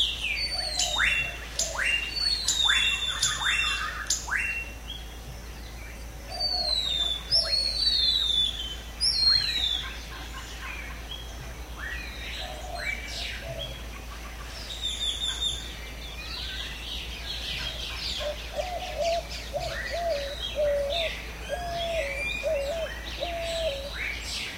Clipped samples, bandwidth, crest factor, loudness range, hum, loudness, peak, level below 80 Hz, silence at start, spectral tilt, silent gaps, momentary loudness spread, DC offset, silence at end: under 0.1%; 16 kHz; 20 dB; 11 LU; none; -27 LUFS; -10 dBFS; -40 dBFS; 0 s; -1 dB/octave; none; 16 LU; under 0.1%; 0 s